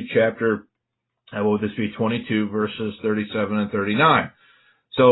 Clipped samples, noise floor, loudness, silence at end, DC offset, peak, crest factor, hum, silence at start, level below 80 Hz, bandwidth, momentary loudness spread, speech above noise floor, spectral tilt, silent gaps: under 0.1%; -80 dBFS; -22 LUFS; 0 s; under 0.1%; -4 dBFS; 18 dB; none; 0 s; -56 dBFS; 4.1 kHz; 9 LU; 58 dB; -11 dB/octave; none